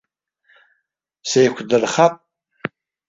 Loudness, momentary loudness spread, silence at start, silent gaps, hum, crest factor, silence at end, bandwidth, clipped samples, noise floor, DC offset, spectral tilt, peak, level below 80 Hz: -17 LUFS; 15 LU; 1.25 s; none; none; 20 dB; 0.4 s; 7.8 kHz; under 0.1%; -74 dBFS; under 0.1%; -4 dB/octave; -2 dBFS; -64 dBFS